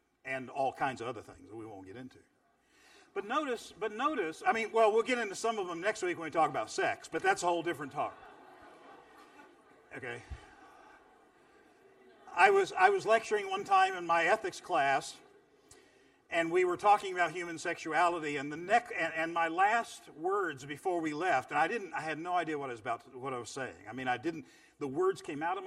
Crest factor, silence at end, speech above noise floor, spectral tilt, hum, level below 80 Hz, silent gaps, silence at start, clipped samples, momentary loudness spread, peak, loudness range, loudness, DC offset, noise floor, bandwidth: 24 dB; 0 s; 36 dB; -4 dB/octave; none; -68 dBFS; none; 0.25 s; under 0.1%; 15 LU; -10 dBFS; 11 LU; -32 LUFS; under 0.1%; -68 dBFS; 13.5 kHz